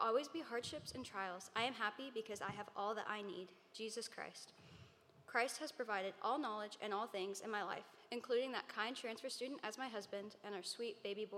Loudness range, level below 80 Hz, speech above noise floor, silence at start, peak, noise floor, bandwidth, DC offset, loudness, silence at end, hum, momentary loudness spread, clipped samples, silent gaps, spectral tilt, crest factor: 3 LU; -86 dBFS; 20 dB; 0 s; -22 dBFS; -65 dBFS; 16 kHz; under 0.1%; -45 LUFS; 0 s; none; 10 LU; under 0.1%; none; -3 dB/octave; 22 dB